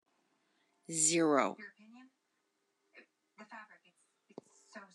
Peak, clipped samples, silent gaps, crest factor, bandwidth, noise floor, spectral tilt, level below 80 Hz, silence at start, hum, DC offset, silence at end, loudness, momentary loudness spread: -16 dBFS; under 0.1%; none; 24 dB; 12 kHz; -82 dBFS; -2.5 dB/octave; under -90 dBFS; 0.9 s; none; under 0.1%; 0.1 s; -31 LUFS; 25 LU